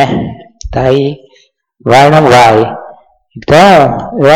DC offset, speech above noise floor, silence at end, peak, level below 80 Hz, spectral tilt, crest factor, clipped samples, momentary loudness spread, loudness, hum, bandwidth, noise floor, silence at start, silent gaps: under 0.1%; 42 dB; 0 s; 0 dBFS; -34 dBFS; -6 dB/octave; 8 dB; 1%; 20 LU; -7 LUFS; none; 18 kHz; -49 dBFS; 0 s; none